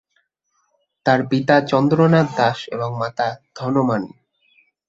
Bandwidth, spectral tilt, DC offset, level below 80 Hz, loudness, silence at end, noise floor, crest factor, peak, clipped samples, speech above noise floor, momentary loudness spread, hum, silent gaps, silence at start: 7.8 kHz; -7.5 dB/octave; under 0.1%; -60 dBFS; -19 LUFS; 0.8 s; -69 dBFS; 18 dB; -2 dBFS; under 0.1%; 51 dB; 10 LU; none; none; 1.05 s